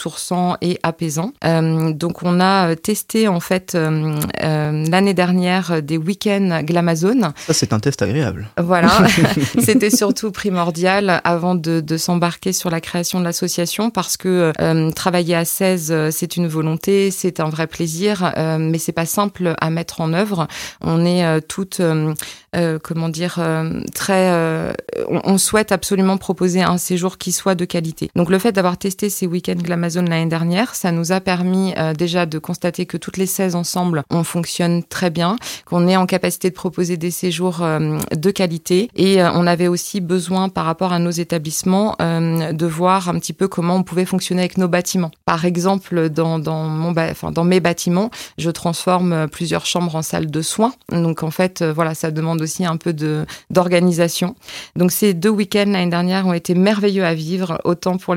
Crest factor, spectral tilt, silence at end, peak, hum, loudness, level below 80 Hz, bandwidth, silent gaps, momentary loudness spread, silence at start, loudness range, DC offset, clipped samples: 18 dB; -5 dB/octave; 0 s; 0 dBFS; none; -18 LUFS; -52 dBFS; 16.5 kHz; none; 6 LU; 0 s; 4 LU; under 0.1%; under 0.1%